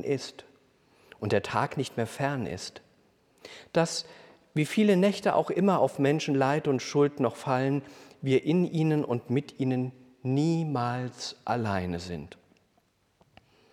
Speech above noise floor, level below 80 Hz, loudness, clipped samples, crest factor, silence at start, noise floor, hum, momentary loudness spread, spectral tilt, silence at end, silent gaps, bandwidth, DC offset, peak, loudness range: 42 dB; -66 dBFS; -28 LUFS; under 0.1%; 18 dB; 0 s; -69 dBFS; none; 13 LU; -6 dB/octave; 1.45 s; none; 14.5 kHz; under 0.1%; -10 dBFS; 7 LU